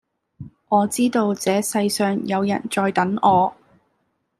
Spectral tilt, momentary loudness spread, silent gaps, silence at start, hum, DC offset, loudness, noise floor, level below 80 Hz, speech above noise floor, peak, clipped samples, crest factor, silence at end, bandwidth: -5 dB/octave; 5 LU; none; 0.4 s; none; under 0.1%; -20 LUFS; -70 dBFS; -62 dBFS; 51 dB; -2 dBFS; under 0.1%; 18 dB; 0.85 s; 15 kHz